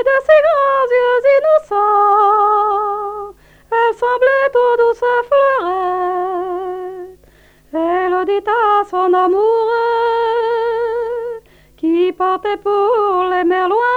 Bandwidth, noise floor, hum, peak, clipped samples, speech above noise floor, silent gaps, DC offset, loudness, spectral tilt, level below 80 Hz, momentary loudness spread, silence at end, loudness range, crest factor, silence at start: 8.2 kHz; -48 dBFS; none; 0 dBFS; under 0.1%; 35 dB; none; under 0.1%; -14 LUFS; -5 dB/octave; -52 dBFS; 11 LU; 0 s; 4 LU; 14 dB; 0 s